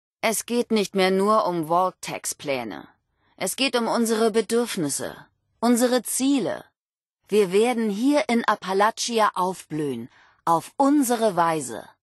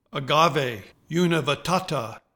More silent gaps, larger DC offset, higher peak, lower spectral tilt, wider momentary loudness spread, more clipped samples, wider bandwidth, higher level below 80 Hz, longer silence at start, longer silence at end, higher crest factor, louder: first, 6.81-6.86 s, 7.06-7.10 s vs none; neither; about the same, -6 dBFS vs -4 dBFS; about the same, -4 dB/octave vs -5 dB/octave; about the same, 10 LU vs 10 LU; neither; second, 12.5 kHz vs 19 kHz; second, -70 dBFS vs -58 dBFS; about the same, 0.25 s vs 0.15 s; about the same, 0.2 s vs 0.15 s; about the same, 18 dB vs 20 dB; about the same, -23 LUFS vs -23 LUFS